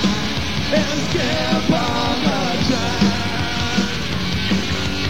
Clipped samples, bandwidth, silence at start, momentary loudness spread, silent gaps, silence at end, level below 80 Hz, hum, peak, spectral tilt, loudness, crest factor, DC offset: under 0.1%; 16.5 kHz; 0 s; 3 LU; none; 0 s; -34 dBFS; none; -4 dBFS; -4.5 dB/octave; -19 LUFS; 16 dB; 4%